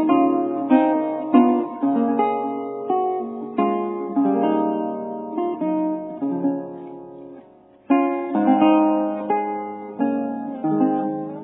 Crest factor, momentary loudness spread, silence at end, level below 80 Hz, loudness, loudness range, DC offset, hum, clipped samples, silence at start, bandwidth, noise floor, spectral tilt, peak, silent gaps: 18 dB; 12 LU; 0 s; -74 dBFS; -21 LUFS; 4 LU; under 0.1%; none; under 0.1%; 0 s; 4 kHz; -49 dBFS; -11 dB/octave; -2 dBFS; none